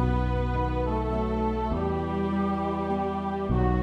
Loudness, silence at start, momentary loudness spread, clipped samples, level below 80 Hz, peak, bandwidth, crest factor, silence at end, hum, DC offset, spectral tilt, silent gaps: -28 LUFS; 0 s; 2 LU; under 0.1%; -32 dBFS; -14 dBFS; 6.2 kHz; 12 dB; 0 s; none; under 0.1%; -9 dB/octave; none